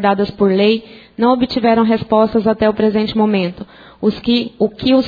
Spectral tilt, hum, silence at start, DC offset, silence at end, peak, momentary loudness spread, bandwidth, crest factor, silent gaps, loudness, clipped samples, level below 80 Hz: -8.5 dB/octave; none; 0 s; under 0.1%; 0 s; 0 dBFS; 7 LU; 5 kHz; 14 dB; none; -15 LUFS; under 0.1%; -46 dBFS